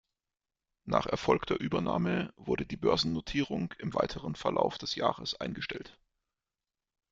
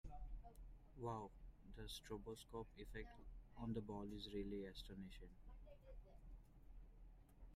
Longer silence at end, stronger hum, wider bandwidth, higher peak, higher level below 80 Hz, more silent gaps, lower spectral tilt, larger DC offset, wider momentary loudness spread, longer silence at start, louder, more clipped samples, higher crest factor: first, 1.2 s vs 0 s; neither; second, 7.8 kHz vs 15.5 kHz; first, -10 dBFS vs -36 dBFS; about the same, -56 dBFS vs -60 dBFS; neither; about the same, -5.5 dB/octave vs -6 dB/octave; neither; second, 7 LU vs 17 LU; first, 0.85 s vs 0.05 s; first, -32 LUFS vs -55 LUFS; neither; about the same, 22 dB vs 18 dB